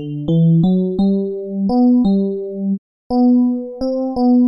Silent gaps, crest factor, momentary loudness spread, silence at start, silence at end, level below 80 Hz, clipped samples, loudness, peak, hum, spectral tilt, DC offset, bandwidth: 2.78-3.10 s; 8 dB; 9 LU; 0 s; 0 s; -44 dBFS; under 0.1%; -16 LUFS; -6 dBFS; none; -12 dB/octave; under 0.1%; 5.8 kHz